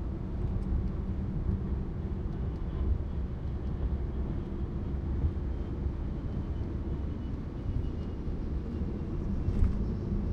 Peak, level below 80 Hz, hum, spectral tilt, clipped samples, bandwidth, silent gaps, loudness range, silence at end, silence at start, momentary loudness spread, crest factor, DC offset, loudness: -14 dBFS; -34 dBFS; none; -10 dB/octave; under 0.1%; 5.6 kHz; none; 2 LU; 0 s; 0 s; 4 LU; 18 dB; under 0.1%; -35 LUFS